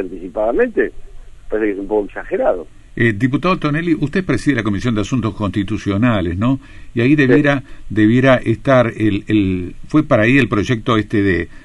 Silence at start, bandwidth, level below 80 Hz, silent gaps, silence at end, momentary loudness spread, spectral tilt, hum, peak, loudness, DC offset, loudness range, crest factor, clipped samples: 0 s; 11.5 kHz; -36 dBFS; none; 0.05 s; 8 LU; -7.5 dB/octave; none; -2 dBFS; -16 LUFS; under 0.1%; 4 LU; 14 dB; under 0.1%